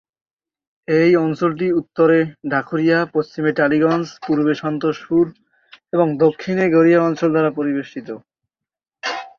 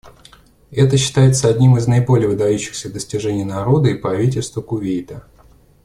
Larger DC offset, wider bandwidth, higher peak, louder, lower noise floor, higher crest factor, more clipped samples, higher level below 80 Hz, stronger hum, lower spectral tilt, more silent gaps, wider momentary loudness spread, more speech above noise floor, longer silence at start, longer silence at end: neither; second, 7 kHz vs 12 kHz; about the same, -2 dBFS vs -2 dBFS; about the same, -18 LUFS vs -16 LUFS; first, -87 dBFS vs -48 dBFS; about the same, 16 dB vs 14 dB; neither; second, -60 dBFS vs -46 dBFS; neither; first, -7.5 dB/octave vs -6 dB/octave; neither; about the same, 11 LU vs 12 LU; first, 70 dB vs 33 dB; first, 0.9 s vs 0.05 s; second, 0.1 s vs 0.65 s